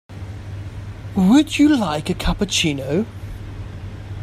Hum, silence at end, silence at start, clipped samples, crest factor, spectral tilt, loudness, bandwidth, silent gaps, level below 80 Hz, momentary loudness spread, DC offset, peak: none; 0 s; 0.1 s; under 0.1%; 18 dB; -5 dB/octave; -18 LUFS; 14.5 kHz; none; -34 dBFS; 19 LU; under 0.1%; -2 dBFS